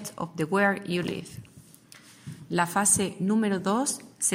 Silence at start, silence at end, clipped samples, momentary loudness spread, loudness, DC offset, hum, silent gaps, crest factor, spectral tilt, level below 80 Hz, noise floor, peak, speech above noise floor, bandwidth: 0 s; 0 s; under 0.1%; 22 LU; -26 LUFS; under 0.1%; none; none; 18 dB; -3.5 dB/octave; -64 dBFS; -52 dBFS; -10 dBFS; 26 dB; 16 kHz